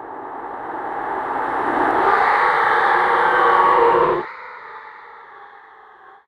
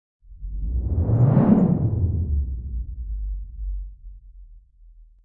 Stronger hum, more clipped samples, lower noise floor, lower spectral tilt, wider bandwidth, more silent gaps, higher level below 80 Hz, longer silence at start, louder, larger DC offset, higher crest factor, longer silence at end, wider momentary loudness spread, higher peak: neither; neither; second, -45 dBFS vs -49 dBFS; second, -5 dB/octave vs -13.5 dB/octave; first, 11.5 kHz vs 2.9 kHz; neither; second, -54 dBFS vs -30 dBFS; second, 0 s vs 0.3 s; first, -17 LUFS vs -23 LUFS; neither; about the same, 16 dB vs 20 dB; first, 0.8 s vs 0.2 s; first, 21 LU vs 18 LU; about the same, -2 dBFS vs -4 dBFS